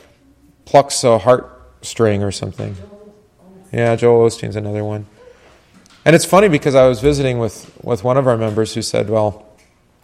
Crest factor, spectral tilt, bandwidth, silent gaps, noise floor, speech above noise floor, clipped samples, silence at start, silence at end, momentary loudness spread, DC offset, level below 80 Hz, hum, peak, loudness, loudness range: 16 dB; -5.5 dB/octave; 15.5 kHz; none; -53 dBFS; 38 dB; under 0.1%; 0.65 s; 0.65 s; 14 LU; under 0.1%; -42 dBFS; none; 0 dBFS; -15 LUFS; 5 LU